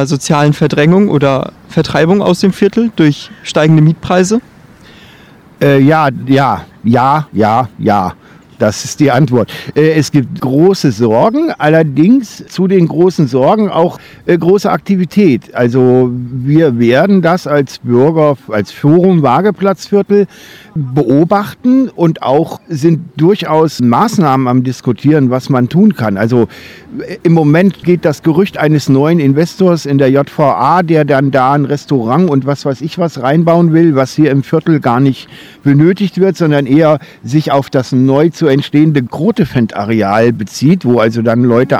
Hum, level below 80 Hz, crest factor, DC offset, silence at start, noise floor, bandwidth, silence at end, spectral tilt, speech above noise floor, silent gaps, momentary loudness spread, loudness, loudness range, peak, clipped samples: none; -48 dBFS; 10 dB; under 0.1%; 0 s; -39 dBFS; 15 kHz; 0 s; -7 dB/octave; 29 dB; none; 6 LU; -10 LUFS; 2 LU; 0 dBFS; 1%